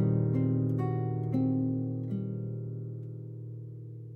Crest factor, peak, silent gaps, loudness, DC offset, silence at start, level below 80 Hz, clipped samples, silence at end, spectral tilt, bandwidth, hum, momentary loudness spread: 14 dB; -16 dBFS; none; -32 LUFS; under 0.1%; 0 s; -64 dBFS; under 0.1%; 0 s; -12.5 dB/octave; 2.4 kHz; none; 14 LU